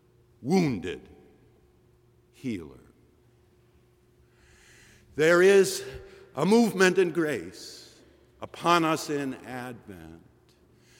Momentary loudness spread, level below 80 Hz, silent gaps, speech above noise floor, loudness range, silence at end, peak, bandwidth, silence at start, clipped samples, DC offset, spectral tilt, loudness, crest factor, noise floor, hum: 24 LU; -62 dBFS; none; 36 dB; 20 LU; 0.85 s; -8 dBFS; 17 kHz; 0.4 s; under 0.1%; under 0.1%; -5 dB/octave; -25 LUFS; 20 dB; -62 dBFS; none